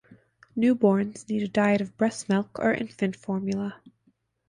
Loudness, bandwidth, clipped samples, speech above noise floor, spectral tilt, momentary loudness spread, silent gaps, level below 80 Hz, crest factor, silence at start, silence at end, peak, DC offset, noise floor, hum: -26 LUFS; 10.5 kHz; under 0.1%; 44 dB; -6.5 dB/octave; 8 LU; none; -64 dBFS; 18 dB; 0.1 s; 0.6 s; -8 dBFS; under 0.1%; -69 dBFS; none